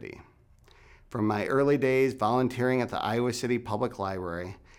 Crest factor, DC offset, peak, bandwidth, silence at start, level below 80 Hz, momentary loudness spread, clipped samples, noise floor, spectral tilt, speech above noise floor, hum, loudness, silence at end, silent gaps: 16 dB; under 0.1%; -12 dBFS; 16.5 kHz; 0 s; -58 dBFS; 11 LU; under 0.1%; -58 dBFS; -6 dB/octave; 30 dB; none; -28 LUFS; 0.25 s; none